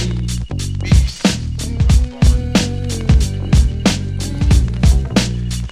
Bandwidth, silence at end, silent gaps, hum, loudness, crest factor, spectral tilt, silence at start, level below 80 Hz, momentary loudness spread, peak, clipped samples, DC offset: 13.5 kHz; 0 s; none; none; -16 LUFS; 14 dB; -5.5 dB/octave; 0 s; -18 dBFS; 8 LU; 0 dBFS; under 0.1%; under 0.1%